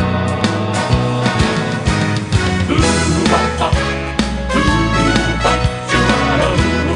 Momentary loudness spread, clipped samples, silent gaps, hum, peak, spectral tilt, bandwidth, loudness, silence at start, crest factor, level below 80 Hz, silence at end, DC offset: 4 LU; under 0.1%; none; none; 0 dBFS; -5 dB/octave; 11 kHz; -15 LUFS; 0 s; 14 dB; -26 dBFS; 0 s; under 0.1%